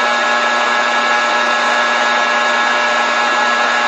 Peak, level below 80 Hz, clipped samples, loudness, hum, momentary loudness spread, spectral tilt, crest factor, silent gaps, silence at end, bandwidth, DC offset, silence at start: -2 dBFS; -64 dBFS; under 0.1%; -13 LUFS; none; 0 LU; 0 dB/octave; 12 dB; none; 0 s; 9.6 kHz; under 0.1%; 0 s